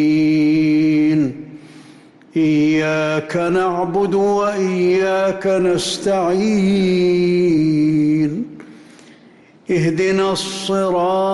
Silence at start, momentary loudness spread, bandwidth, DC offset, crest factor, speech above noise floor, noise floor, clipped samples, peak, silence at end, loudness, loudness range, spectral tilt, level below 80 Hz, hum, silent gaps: 0 s; 6 LU; 12 kHz; under 0.1%; 8 dB; 31 dB; -47 dBFS; under 0.1%; -8 dBFS; 0 s; -16 LUFS; 3 LU; -6 dB/octave; -54 dBFS; none; none